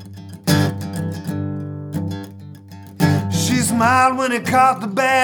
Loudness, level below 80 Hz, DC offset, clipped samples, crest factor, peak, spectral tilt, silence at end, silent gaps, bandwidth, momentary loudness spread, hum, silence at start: -18 LUFS; -54 dBFS; under 0.1%; under 0.1%; 16 dB; -2 dBFS; -5 dB/octave; 0 s; none; over 20 kHz; 21 LU; none; 0 s